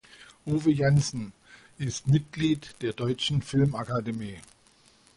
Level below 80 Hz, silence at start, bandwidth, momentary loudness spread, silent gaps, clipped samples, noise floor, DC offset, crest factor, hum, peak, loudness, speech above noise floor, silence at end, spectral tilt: -54 dBFS; 0.2 s; 11.5 kHz; 14 LU; none; under 0.1%; -60 dBFS; under 0.1%; 16 dB; none; -12 dBFS; -27 LUFS; 34 dB; 0.75 s; -6 dB/octave